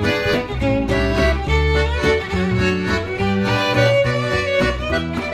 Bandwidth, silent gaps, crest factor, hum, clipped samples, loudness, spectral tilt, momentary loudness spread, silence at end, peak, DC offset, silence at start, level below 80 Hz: 14 kHz; none; 16 dB; none; under 0.1%; -18 LUFS; -6 dB/octave; 5 LU; 0 s; -2 dBFS; under 0.1%; 0 s; -26 dBFS